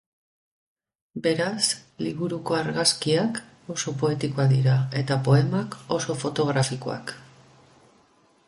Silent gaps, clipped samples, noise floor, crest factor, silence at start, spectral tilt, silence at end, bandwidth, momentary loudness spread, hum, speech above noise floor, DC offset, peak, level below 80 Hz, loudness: none; under 0.1%; -61 dBFS; 18 dB; 1.15 s; -5 dB/octave; 1.25 s; 11.5 kHz; 12 LU; none; 37 dB; under 0.1%; -6 dBFS; -62 dBFS; -25 LUFS